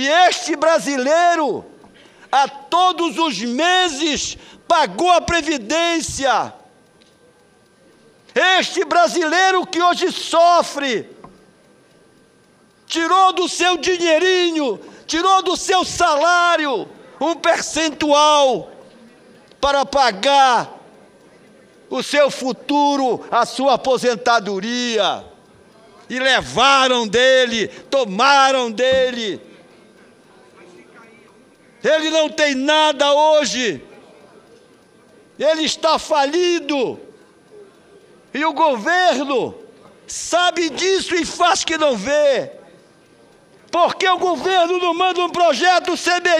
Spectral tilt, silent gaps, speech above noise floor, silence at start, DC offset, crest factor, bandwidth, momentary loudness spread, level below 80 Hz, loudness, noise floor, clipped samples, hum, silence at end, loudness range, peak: -2 dB/octave; none; 37 dB; 0 s; under 0.1%; 16 dB; 14 kHz; 9 LU; -52 dBFS; -16 LUFS; -53 dBFS; under 0.1%; none; 0 s; 4 LU; -2 dBFS